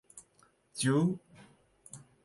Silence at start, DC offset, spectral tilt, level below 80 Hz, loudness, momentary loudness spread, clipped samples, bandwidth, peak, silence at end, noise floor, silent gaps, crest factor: 0.15 s; under 0.1%; -5.5 dB/octave; -72 dBFS; -31 LUFS; 25 LU; under 0.1%; 11.5 kHz; -18 dBFS; 0.25 s; -68 dBFS; none; 18 dB